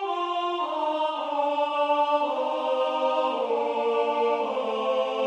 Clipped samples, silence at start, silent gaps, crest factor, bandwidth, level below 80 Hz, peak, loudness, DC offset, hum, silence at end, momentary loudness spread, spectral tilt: under 0.1%; 0 s; none; 14 dB; 9.4 kHz; -84 dBFS; -12 dBFS; -26 LUFS; under 0.1%; none; 0 s; 3 LU; -3.5 dB/octave